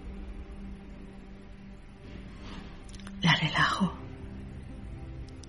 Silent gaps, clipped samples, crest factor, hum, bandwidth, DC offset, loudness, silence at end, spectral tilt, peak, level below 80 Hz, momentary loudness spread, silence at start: none; under 0.1%; 24 dB; none; 11.5 kHz; 0.1%; -27 LUFS; 0 s; -4.5 dB/octave; -10 dBFS; -46 dBFS; 23 LU; 0 s